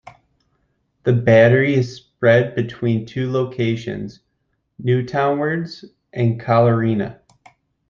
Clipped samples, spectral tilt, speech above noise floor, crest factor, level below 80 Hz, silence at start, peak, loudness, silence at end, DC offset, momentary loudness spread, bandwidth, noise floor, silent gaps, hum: under 0.1%; -8 dB/octave; 53 dB; 18 dB; -56 dBFS; 0.05 s; -2 dBFS; -18 LUFS; 0.75 s; under 0.1%; 15 LU; 7 kHz; -70 dBFS; none; none